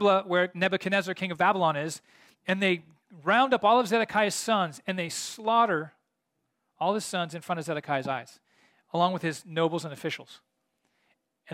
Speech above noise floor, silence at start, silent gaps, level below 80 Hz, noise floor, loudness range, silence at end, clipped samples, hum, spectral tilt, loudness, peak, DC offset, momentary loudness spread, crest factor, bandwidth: 53 dB; 0 s; none; -76 dBFS; -80 dBFS; 7 LU; 0 s; under 0.1%; none; -4 dB/octave; -27 LUFS; -10 dBFS; under 0.1%; 11 LU; 18 dB; 16.5 kHz